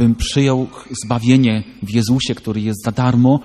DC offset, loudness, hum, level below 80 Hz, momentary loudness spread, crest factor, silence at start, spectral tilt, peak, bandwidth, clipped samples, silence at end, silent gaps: under 0.1%; -17 LUFS; none; -36 dBFS; 9 LU; 16 dB; 0 s; -6 dB/octave; 0 dBFS; 13.5 kHz; under 0.1%; 0 s; none